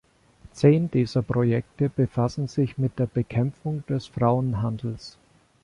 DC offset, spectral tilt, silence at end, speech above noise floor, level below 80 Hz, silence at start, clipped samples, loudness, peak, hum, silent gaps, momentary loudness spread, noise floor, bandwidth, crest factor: under 0.1%; -8.5 dB/octave; 0.55 s; 29 dB; -52 dBFS; 0.45 s; under 0.1%; -25 LUFS; -6 dBFS; none; none; 10 LU; -52 dBFS; 10.5 kHz; 18 dB